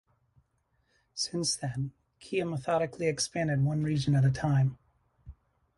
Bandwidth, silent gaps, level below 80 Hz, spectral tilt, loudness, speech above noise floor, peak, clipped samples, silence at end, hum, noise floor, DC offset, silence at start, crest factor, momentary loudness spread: 11.5 kHz; none; -58 dBFS; -5.5 dB/octave; -30 LUFS; 45 dB; -16 dBFS; under 0.1%; 0.45 s; none; -74 dBFS; under 0.1%; 1.15 s; 16 dB; 9 LU